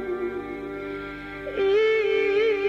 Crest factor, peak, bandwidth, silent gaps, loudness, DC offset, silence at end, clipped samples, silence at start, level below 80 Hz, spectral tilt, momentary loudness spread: 10 dB; -14 dBFS; 7 kHz; none; -25 LUFS; under 0.1%; 0 s; under 0.1%; 0 s; -52 dBFS; -5.5 dB/octave; 13 LU